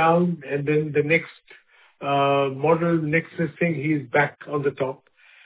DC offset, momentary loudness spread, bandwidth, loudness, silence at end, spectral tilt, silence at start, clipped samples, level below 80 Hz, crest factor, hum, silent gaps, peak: under 0.1%; 9 LU; 4 kHz; -23 LUFS; 0.5 s; -10.5 dB/octave; 0 s; under 0.1%; -64 dBFS; 16 dB; none; none; -6 dBFS